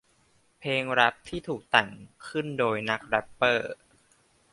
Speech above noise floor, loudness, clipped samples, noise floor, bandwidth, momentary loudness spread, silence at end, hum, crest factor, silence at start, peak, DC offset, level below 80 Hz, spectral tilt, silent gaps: 38 dB; -27 LUFS; under 0.1%; -65 dBFS; 11.5 kHz; 15 LU; 0.8 s; none; 26 dB; 0.6 s; -4 dBFS; under 0.1%; -62 dBFS; -4.5 dB/octave; none